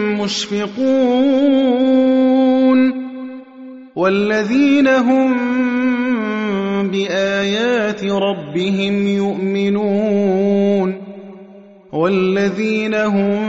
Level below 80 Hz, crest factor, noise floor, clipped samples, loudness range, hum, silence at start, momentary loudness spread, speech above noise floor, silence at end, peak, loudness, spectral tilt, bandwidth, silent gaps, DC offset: -58 dBFS; 12 dB; -41 dBFS; under 0.1%; 3 LU; none; 0 s; 9 LU; 26 dB; 0 s; -4 dBFS; -16 LUFS; -6 dB/octave; 7.8 kHz; none; under 0.1%